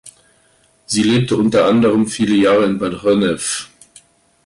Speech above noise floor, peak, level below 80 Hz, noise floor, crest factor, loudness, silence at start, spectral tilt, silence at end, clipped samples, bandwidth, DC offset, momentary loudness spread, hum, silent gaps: 41 dB; -4 dBFS; -50 dBFS; -55 dBFS; 12 dB; -15 LUFS; 0.05 s; -5 dB/octave; 0.8 s; under 0.1%; 11.5 kHz; under 0.1%; 8 LU; none; none